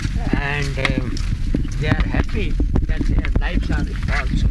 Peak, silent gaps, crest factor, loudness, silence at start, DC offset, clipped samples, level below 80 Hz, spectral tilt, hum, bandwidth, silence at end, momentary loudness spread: -2 dBFS; none; 16 dB; -22 LUFS; 0 s; under 0.1%; under 0.1%; -20 dBFS; -6.5 dB/octave; none; 10.5 kHz; 0 s; 3 LU